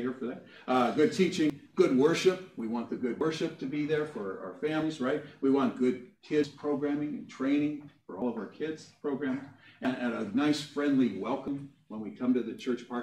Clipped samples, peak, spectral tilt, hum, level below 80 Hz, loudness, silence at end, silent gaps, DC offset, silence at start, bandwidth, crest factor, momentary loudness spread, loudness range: under 0.1%; -12 dBFS; -6 dB/octave; none; -74 dBFS; -31 LUFS; 0 s; none; under 0.1%; 0 s; 12 kHz; 20 dB; 12 LU; 5 LU